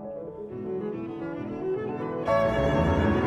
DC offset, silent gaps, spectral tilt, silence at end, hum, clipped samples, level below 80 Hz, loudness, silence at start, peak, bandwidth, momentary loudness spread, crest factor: under 0.1%; none; -8 dB/octave; 0 s; none; under 0.1%; -40 dBFS; -28 LUFS; 0 s; -12 dBFS; 12 kHz; 13 LU; 16 dB